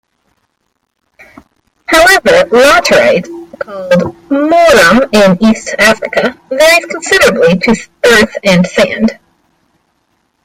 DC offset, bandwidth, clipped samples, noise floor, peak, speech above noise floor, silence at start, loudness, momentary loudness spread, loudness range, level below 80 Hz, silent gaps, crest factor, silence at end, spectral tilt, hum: under 0.1%; 17 kHz; 0.3%; -64 dBFS; 0 dBFS; 56 dB; 1.9 s; -8 LUFS; 10 LU; 2 LU; -38 dBFS; none; 10 dB; 1.3 s; -4 dB/octave; none